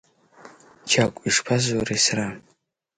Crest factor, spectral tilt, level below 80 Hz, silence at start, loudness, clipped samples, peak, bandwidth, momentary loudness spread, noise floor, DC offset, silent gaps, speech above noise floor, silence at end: 20 dB; -3 dB/octave; -56 dBFS; 0.45 s; -22 LUFS; under 0.1%; -4 dBFS; 10.5 kHz; 14 LU; -67 dBFS; under 0.1%; none; 44 dB; 0.6 s